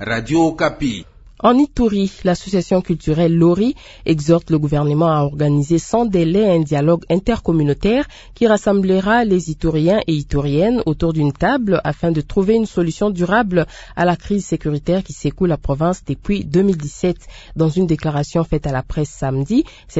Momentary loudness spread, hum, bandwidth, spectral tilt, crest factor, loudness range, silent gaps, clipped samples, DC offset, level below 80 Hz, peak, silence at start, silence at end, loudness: 7 LU; none; 8 kHz; -7 dB/octave; 16 dB; 3 LU; none; under 0.1%; under 0.1%; -34 dBFS; 0 dBFS; 0 s; 0 s; -17 LUFS